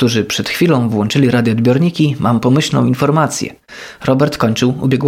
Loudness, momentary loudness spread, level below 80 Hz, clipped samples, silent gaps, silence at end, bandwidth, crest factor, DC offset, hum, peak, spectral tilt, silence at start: -14 LUFS; 7 LU; -48 dBFS; under 0.1%; none; 0 s; 16 kHz; 12 dB; under 0.1%; none; 0 dBFS; -6 dB/octave; 0 s